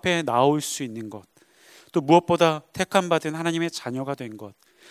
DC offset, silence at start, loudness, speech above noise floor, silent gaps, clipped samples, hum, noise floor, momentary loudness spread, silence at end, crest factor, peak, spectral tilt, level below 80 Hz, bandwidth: under 0.1%; 0.05 s; -23 LUFS; 30 dB; none; under 0.1%; none; -53 dBFS; 18 LU; 0.4 s; 22 dB; -2 dBFS; -5 dB/octave; -62 dBFS; 16 kHz